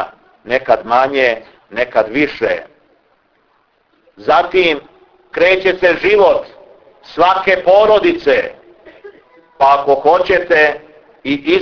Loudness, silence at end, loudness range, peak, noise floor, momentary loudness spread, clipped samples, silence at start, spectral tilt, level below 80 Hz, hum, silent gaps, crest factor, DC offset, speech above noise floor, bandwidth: -13 LUFS; 0 s; 5 LU; 0 dBFS; -58 dBFS; 14 LU; under 0.1%; 0 s; -5.5 dB/octave; -48 dBFS; none; none; 14 dB; under 0.1%; 46 dB; 5.4 kHz